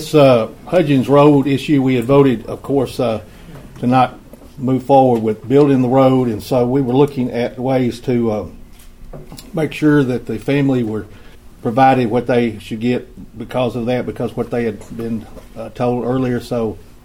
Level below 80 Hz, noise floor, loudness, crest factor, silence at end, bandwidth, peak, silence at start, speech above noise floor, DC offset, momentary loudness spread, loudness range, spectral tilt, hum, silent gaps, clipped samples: -42 dBFS; -36 dBFS; -16 LUFS; 16 dB; 0.25 s; 16.5 kHz; 0 dBFS; 0 s; 21 dB; under 0.1%; 13 LU; 6 LU; -7.5 dB/octave; none; none; under 0.1%